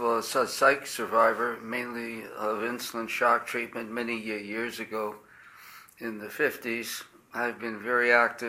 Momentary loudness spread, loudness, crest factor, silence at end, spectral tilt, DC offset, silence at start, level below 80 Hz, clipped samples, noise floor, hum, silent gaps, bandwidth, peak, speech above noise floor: 15 LU; -28 LUFS; 22 dB; 0 s; -3 dB/octave; under 0.1%; 0 s; -72 dBFS; under 0.1%; -51 dBFS; none; none; 16.5 kHz; -8 dBFS; 22 dB